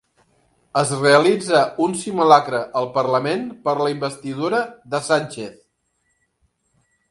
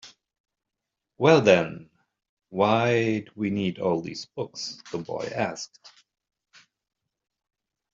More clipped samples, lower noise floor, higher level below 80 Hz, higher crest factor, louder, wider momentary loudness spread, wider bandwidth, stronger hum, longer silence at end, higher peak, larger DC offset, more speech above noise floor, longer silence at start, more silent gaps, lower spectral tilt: neither; second, -69 dBFS vs -85 dBFS; about the same, -64 dBFS vs -68 dBFS; about the same, 20 dB vs 24 dB; first, -19 LUFS vs -25 LUFS; second, 12 LU vs 17 LU; first, 11.5 kHz vs 7.8 kHz; neither; second, 1.6 s vs 2.05 s; first, 0 dBFS vs -4 dBFS; neither; second, 50 dB vs 61 dB; first, 0.75 s vs 0.05 s; second, none vs 0.40-0.44 s, 2.29-2.37 s; about the same, -4.5 dB/octave vs -5.5 dB/octave